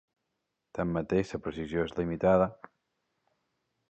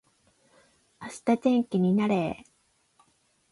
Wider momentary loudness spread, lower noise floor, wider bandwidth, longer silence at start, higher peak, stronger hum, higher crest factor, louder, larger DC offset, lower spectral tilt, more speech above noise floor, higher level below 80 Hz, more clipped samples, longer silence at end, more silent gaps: second, 10 LU vs 18 LU; first, -83 dBFS vs -69 dBFS; second, 8.4 kHz vs 11.5 kHz; second, 0.75 s vs 1 s; about the same, -12 dBFS vs -12 dBFS; neither; about the same, 20 dB vs 18 dB; second, -30 LUFS vs -26 LUFS; neither; about the same, -8 dB/octave vs -7.5 dB/octave; first, 54 dB vs 44 dB; first, -54 dBFS vs -66 dBFS; neither; first, 1.35 s vs 1.15 s; neither